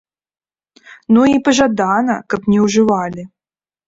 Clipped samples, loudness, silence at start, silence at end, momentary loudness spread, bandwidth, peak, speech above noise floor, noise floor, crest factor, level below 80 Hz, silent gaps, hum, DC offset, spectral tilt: under 0.1%; -14 LUFS; 0.9 s; 0.6 s; 7 LU; 7.8 kHz; -2 dBFS; over 77 dB; under -90 dBFS; 14 dB; -50 dBFS; none; none; under 0.1%; -5 dB/octave